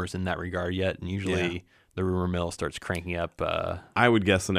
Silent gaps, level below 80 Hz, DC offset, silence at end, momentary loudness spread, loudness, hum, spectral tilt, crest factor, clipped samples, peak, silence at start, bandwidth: none; -50 dBFS; under 0.1%; 0 s; 10 LU; -28 LUFS; none; -5.5 dB/octave; 22 dB; under 0.1%; -6 dBFS; 0 s; 15.5 kHz